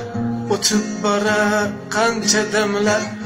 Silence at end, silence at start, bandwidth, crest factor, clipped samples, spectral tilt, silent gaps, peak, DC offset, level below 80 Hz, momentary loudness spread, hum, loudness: 0 s; 0 s; 16 kHz; 16 dB; under 0.1%; -3 dB/octave; none; -2 dBFS; under 0.1%; -52 dBFS; 5 LU; none; -18 LUFS